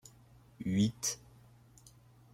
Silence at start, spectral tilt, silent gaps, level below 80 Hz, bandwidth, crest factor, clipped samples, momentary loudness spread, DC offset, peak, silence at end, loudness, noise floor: 0.6 s; -4.5 dB/octave; none; -66 dBFS; 16.5 kHz; 20 dB; under 0.1%; 16 LU; under 0.1%; -18 dBFS; 1.15 s; -35 LUFS; -61 dBFS